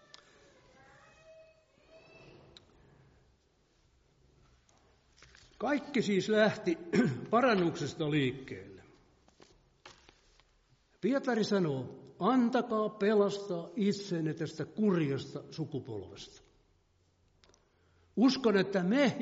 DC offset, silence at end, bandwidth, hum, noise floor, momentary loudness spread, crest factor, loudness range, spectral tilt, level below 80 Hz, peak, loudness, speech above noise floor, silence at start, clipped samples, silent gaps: under 0.1%; 0 s; 7.6 kHz; none; -71 dBFS; 16 LU; 18 dB; 9 LU; -5 dB/octave; -70 dBFS; -16 dBFS; -31 LUFS; 40 dB; 1.3 s; under 0.1%; none